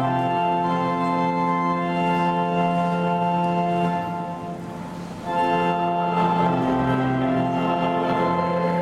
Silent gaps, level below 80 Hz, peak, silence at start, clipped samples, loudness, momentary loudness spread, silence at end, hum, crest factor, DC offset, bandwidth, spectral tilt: none; -52 dBFS; -8 dBFS; 0 s; under 0.1%; -22 LUFS; 8 LU; 0 s; none; 14 dB; under 0.1%; 10 kHz; -7.5 dB/octave